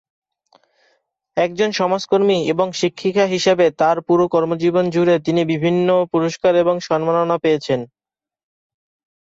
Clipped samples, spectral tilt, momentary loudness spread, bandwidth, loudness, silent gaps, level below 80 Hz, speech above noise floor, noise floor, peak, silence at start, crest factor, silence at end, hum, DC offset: under 0.1%; -5.5 dB/octave; 5 LU; 7.8 kHz; -17 LUFS; none; -60 dBFS; 48 dB; -64 dBFS; -4 dBFS; 1.35 s; 14 dB; 1.35 s; none; under 0.1%